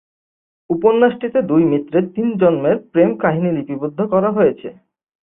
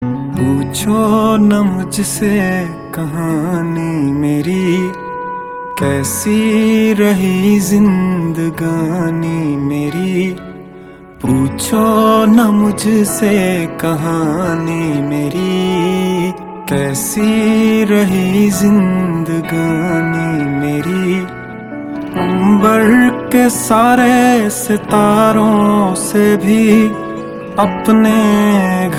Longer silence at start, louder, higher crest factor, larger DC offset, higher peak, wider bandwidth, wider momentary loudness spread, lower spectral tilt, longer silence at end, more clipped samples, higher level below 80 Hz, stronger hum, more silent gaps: first, 0.7 s vs 0 s; second, -16 LUFS vs -13 LUFS; about the same, 16 dB vs 12 dB; neither; about the same, -2 dBFS vs 0 dBFS; second, 3.8 kHz vs 16.5 kHz; about the same, 8 LU vs 10 LU; first, -12.5 dB/octave vs -6 dB/octave; first, 0.55 s vs 0 s; neither; second, -58 dBFS vs -44 dBFS; neither; neither